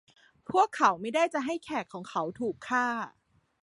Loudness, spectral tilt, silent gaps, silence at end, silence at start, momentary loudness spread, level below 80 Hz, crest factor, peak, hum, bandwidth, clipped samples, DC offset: -29 LUFS; -4 dB/octave; none; 0.55 s; 0.5 s; 11 LU; -72 dBFS; 22 dB; -8 dBFS; none; 11.5 kHz; under 0.1%; under 0.1%